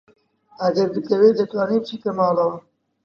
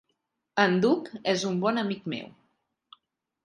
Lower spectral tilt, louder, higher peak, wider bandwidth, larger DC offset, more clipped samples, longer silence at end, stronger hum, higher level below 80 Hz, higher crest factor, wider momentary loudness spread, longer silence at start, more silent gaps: first, -7.5 dB/octave vs -5 dB/octave; first, -20 LUFS vs -27 LUFS; about the same, -4 dBFS vs -6 dBFS; second, 6.8 kHz vs 10.5 kHz; neither; neither; second, 0.45 s vs 1.15 s; neither; about the same, -70 dBFS vs -74 dBFS; about the same, 18 dB vs 22 dB; second, 8 LU vs 13 LU; about the same, 0.6 s vs 0.55 s; neither